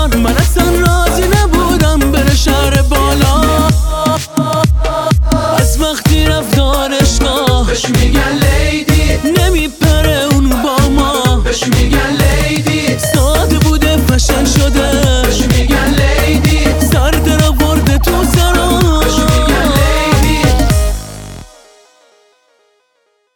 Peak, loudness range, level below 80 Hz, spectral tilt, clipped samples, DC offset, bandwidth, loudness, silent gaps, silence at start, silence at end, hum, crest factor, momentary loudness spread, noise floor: 0 dBFS; 2 LU; -14 dBFS; -5 dB/octave; under 0.1%; under 0.1%; 19 kHz; -11 LUFS; none; 0 s; 1.9 s; none; 10 dB; 2 LU; -60 dBFS